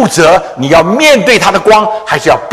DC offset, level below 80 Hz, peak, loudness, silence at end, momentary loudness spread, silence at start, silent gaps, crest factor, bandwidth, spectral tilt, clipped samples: under 0.1%; -38 dBFS; 0 dBFS; -7 LUFS; 0 s; 5 LU; 0 s; none; 8 dB; 16 kHz; -4 dB/octave; 3%